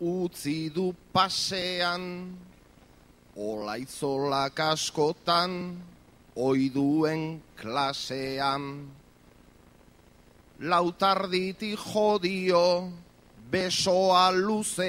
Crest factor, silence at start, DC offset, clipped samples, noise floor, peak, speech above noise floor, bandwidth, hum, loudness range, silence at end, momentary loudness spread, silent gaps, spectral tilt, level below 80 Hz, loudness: 20 dB; 0 s; under 0.1%; under 0.1%; -57 dBFS; -8 dBFS; 29 dB; 16 kHz; none; 6 LU; 0 s; 15 LU; none; -4 dB/octave; -62 dBFS; -27 LUFS